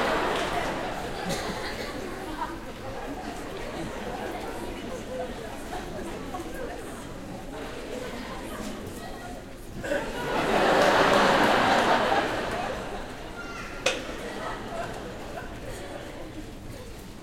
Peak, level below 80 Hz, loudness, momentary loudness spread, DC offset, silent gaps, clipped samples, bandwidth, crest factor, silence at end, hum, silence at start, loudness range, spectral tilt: -6 dBFS; -44 dBFS; -29 LUFS; 18 LU; under 0.1%; none; under 0.1%; 16.5 kHz; 22 dB; 0 s; none; 0 s; 14 LU; -4 dB/octave